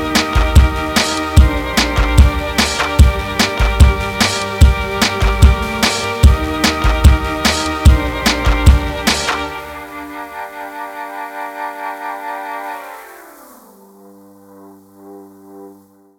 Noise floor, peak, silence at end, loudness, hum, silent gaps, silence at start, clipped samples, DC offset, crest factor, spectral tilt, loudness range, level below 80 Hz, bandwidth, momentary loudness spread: -44 dBFS; 0 dBFS; 0.45 s; -14 LUFS; none; none; 0 s; 0.6%; under 0.1%; 14 dB; -4.5 dB/octave; 14 LU; -16 dBFS; 16.5 kHz; 15 LU